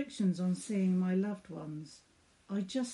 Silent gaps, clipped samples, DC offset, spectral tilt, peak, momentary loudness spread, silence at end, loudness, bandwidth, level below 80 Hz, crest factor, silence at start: none; under 0.1%; under 0.1%; -7 dB/octave; -22 dBFS; 14 LU; 0 s; -35 LUFS; 11.5 kHz; -76 dBFS; 12 dB; 0 s